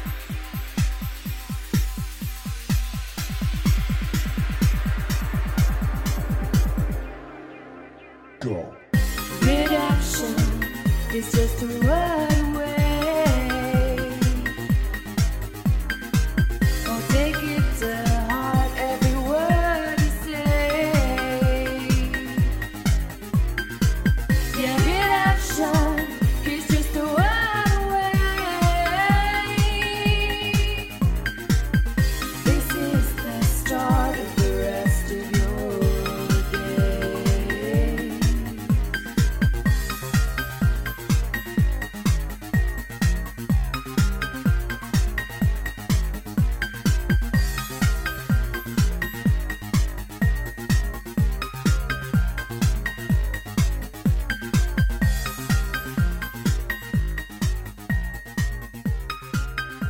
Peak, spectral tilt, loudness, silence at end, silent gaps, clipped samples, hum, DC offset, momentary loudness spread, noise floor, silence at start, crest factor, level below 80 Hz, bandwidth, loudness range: -6 dBFS; -5.5 dB/octave; -24 LUFS; 0 s; none; under 0.1%; none; under 0.1%; 7 LU; -45 dBFS; 0 s; 16 dB; -26 dBFS; 17 kHz; 4 LU